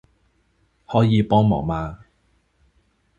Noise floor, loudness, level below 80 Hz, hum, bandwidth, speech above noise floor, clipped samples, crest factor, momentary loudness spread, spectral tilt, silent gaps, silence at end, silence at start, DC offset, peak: -64 dBFS; -20 LUFS; -44 dBFS; none; 7.2 kHz; 46 dB; under 0.1%; 20 dB; 11 LU; -9 dB/octave; none; 1.25 s; 0.9 s; under 0.1%; -4 dBFS